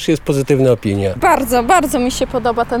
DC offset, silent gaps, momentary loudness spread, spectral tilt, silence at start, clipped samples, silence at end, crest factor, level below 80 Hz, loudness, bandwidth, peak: under 0.1%; none; 5 LU; -5.5 dB/octave; 0 s; under 0.1%; 0 s; 14 dB; -34 dBFS; -15 LUFS; 18.5 kHz; 0 dBFS